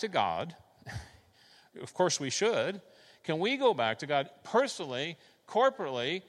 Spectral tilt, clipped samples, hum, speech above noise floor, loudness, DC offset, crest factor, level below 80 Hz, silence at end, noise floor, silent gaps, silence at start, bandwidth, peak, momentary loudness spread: -3.5 dB/octave; under 0.1%; none; 31 dB; -31 LUFS; under 0.1%; 20 dB; -66 dBFS; 0.1 s; -62 dBFS; none; 0 s; 12.5 kHz; -14 dBFS; 17 LU